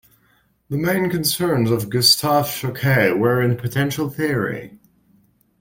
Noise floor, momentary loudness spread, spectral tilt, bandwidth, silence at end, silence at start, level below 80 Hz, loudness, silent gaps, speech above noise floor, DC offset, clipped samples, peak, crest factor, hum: -61 dBFS; 9 LU; -4.5 dB/octave; 17 kHz; 0.85 s; 0.7 s; -52 dBFS; -19 LUFS; none; 42 dB; under 0.1%; under 0.1%; -2 dBFS; 18 dB; none